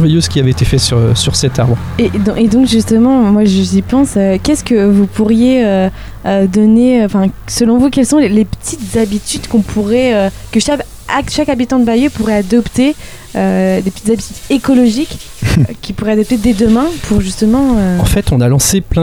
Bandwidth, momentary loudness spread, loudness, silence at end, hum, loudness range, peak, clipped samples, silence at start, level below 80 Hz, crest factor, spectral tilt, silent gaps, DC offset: 19.5 kHz; 7 LU; -11 LUFS; 0 s; none; 3 LU; 0 dBFS; under 0.1%; 0 s; -28 dBFS; 10 dB; -5.5 dB/octave; none; 0.2%